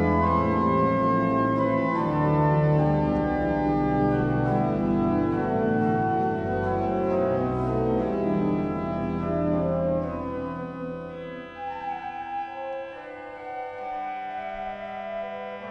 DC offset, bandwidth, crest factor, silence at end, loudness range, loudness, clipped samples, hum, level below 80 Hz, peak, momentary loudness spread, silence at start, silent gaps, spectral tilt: under 0.1%; 6.4 kHz; 16 dB; 0 s; 11 LU; -26 LUFS; under 0.1%; none; -44 dBFS; -10 dBFS; 12 LU; 0 s; none; -10 dB/octave